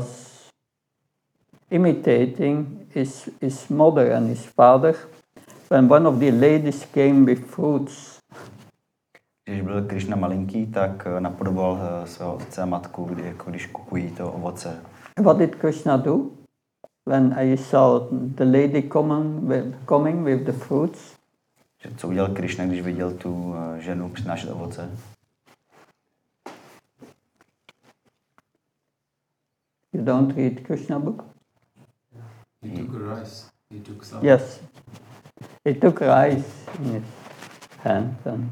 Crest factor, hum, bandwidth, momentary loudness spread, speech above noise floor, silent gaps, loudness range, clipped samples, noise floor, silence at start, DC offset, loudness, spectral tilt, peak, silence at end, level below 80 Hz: 22 dB; none; 12.5 kHz; 18 LU; 59 dB; none; 12 LU; under 0.1%; -80 dBFS; 0 s; under 0.1%; -21 LUFS; -8 dB/octave; -2 dBFS; 0 s; -72 dBFS